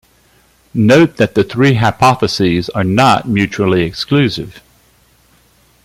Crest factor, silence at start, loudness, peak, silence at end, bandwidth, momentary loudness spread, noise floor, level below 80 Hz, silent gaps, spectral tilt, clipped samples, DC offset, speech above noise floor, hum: 14 dB; 0.75 s; -12 LUFS; 0 dBFS; 1.25 s; 16 kHz; 6 LU; -51 dBFS; -44 dBFS; none; -6 dB/octave; under 0.1%; under 0.1%; 39 dB; none